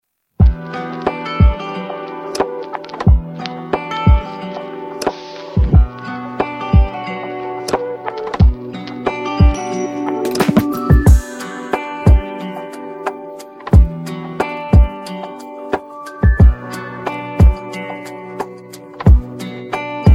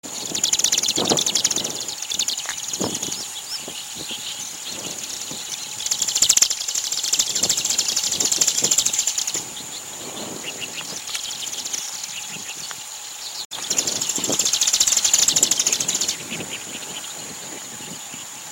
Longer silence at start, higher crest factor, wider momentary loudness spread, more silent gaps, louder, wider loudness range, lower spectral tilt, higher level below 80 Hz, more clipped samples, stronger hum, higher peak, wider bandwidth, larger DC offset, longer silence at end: first, 0.4 s vs 0.05 s; second, 16 dB vs 24 dB; about the same, 15 LU vs 15 LU; second, none vs 13.45-13.50 s; first, -17 LUFS vs -20 LUFS; second, 3 LU vs 9 LU; first, -7.5 dB/octave vs 0.5 dB/octave; first, -18 dBFS vs -60 dBFS; neither; neither; about the same, 0 dBFS vs 0 dBFS; second, 13 kHz vs 17 kHz; neither; about the same, 0 s vs 0 s